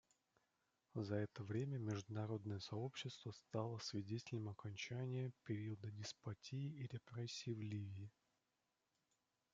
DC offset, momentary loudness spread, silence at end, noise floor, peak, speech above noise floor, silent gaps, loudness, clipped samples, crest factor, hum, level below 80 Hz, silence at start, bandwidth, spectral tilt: under 0.1%; 6 LU; 1.45 s; -89 dBFS; -30 dBFS; 41 dB; none; -49 LUFS; under 0.1%; 20 dB; none; -84 dBFS; 0.95 s; 7.8 kHz; -6 dB/octave